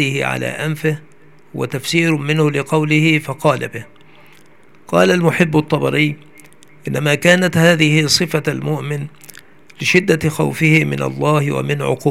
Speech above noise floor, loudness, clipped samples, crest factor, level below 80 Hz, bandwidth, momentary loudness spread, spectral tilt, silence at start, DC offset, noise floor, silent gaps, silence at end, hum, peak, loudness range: 33 dB; -15 LUFS; under 0.1%; 16 dB; -54 dBFS; 16 kHz; 12 LU; -5 dB/octave; 0 s; 0.6%; -49 dBFS; none; 0 s; none; 0 dBFS; 3 LU